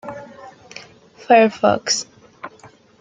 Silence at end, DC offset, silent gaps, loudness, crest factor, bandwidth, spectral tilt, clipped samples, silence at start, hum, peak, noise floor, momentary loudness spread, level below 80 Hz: 0.5 s; under 0.1%; none; -16 LUFS; 20 dB; 9.4 kHz; -3 dB/octave; under 0.1%; 0.05 s; none; -2 dBFS; -47 dBFS; 25 LU; -64 dBFS